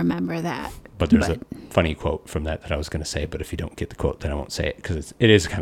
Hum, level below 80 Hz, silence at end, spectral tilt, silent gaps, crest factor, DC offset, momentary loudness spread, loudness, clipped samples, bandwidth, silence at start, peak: none; -36 dBFS; 0 s; -5.5 dB/octave; none; 22 dB; under 0.1%; 12 LU; -24 LUFS; under 0.1%; 16.5 kHz; 0 s; -2 dBFS